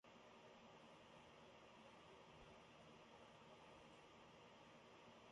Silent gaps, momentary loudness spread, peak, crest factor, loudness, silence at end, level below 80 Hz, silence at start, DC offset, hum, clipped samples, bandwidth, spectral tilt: none; 1 LU; -52 dBFS; 14 dB; -65 LUFS; 0 s; -84 dBFS; 0.05 s; under 0.1%; none; under 0.1%; 11 kHz; -4 dB/octave